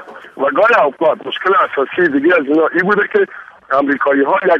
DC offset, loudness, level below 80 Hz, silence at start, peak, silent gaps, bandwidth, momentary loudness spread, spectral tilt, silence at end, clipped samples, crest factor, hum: under 0.1%; -14 LUFS; -60 dBFS; 0 s; -2 dBFS; none; 7 kHz; 7 LU; -6.5 dB/octave; 0 s; under 0.1%; 12 dB; none